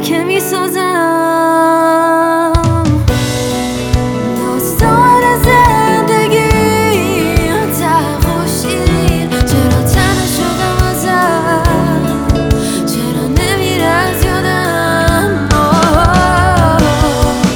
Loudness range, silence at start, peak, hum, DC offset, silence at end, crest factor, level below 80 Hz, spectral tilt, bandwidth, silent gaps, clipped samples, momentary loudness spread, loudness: 3 LU; 0 s; 0 dBFS; none; under 0.1%; 0 s; 10 dB; -22 dBFS; -5 dB/octave; over 20 kHz; none; under 0.1%; 6 LU; -11 LUFS